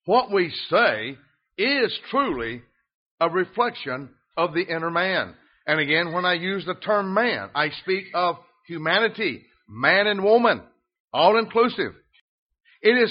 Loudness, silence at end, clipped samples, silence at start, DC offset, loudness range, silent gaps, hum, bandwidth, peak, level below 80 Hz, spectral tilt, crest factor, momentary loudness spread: -22 LUFS; 0 s; under 0.1%; 0.05 s; under 0.1%; 4 LU; 2.94-3.18 s, 11.00-11.08 s, 12.21-12.50 s; none; 5.4 kHz; -4 dBFS; -62 dBFS; -2 dB/octave; 20 dB; 13 LU